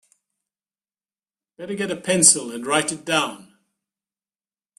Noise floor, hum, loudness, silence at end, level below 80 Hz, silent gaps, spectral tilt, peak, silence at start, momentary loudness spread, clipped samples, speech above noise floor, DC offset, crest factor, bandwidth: under -90 dBFS; none; -19 LUFS; 1.35 s; -66 dBFS; none; -2 dB/octave; 0 dBFS; 1.6 s; 15 LU; under 0.1%; over 69 dB; under 0.1%; 24 dB; 15.5 kHz